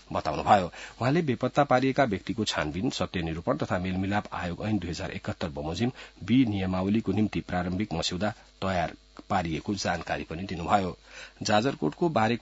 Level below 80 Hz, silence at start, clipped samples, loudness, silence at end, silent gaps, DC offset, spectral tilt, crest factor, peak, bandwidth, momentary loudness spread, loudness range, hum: -54 dBFS; 0.1 s; under 0.1%; -28 LUFS; 0 s; none; under 0.1%; -5.5 dB/octave; 22 dB; -6 dBFS; 8 kHz; 10 LU; 4 LU; none